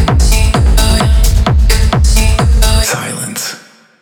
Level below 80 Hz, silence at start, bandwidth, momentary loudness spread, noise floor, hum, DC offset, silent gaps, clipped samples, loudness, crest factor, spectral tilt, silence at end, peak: -10 dBFS; 0 s; 19 kHz; 8 LU; -34 dBFS; none; under 0.1%; none; under 0.1%; -11 LUFS; 8 dB; -4.5 dB/octave; 0.45 s; 0 dBFS